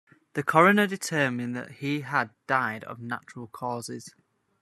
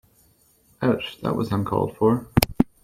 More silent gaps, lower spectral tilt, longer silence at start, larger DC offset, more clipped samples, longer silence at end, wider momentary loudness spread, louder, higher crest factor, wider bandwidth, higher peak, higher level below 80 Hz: neither; about the same, -5 dB/octave vs -6 dB/octave; second, 0.35 s vs 0.8 s; neither; neither; first, 0.55 s vs 0.2 s; first, 16 LU vs 6 LU; second, -26 LUFS vs -23 LUFS; about the same, 24 dB vs 24 dB; second, 13.5 kHz vs 16.5 kHz; second, -4 dBFS vs 0 dBFS; second, -72 dBFS vs -42 dBFS